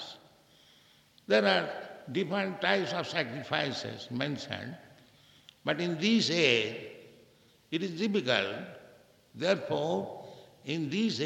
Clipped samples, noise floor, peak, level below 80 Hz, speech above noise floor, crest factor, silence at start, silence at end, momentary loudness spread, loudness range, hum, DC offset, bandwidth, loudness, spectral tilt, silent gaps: under 0.1%; -62 dBFS; -10 dBFS; -76 dBFS; 32 dB; 24 dB; 0 s; 0 s; 18 LU; 4 LU; none; under 0.1%; 15 kHz; -30 LUFS; -4.5 dB/octave; none